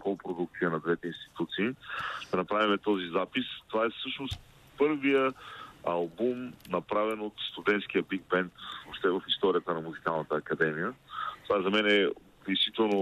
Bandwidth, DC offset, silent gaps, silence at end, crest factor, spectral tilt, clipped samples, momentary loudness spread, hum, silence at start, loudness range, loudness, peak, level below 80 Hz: 13 kHz; under 0.1%; none; 0 s; 18 dB; -6 dB/octave; under 0.1%; 11 LU; none; 0 s; 2 LU; -31 LUFS; -12 dBFS; -64 dBFS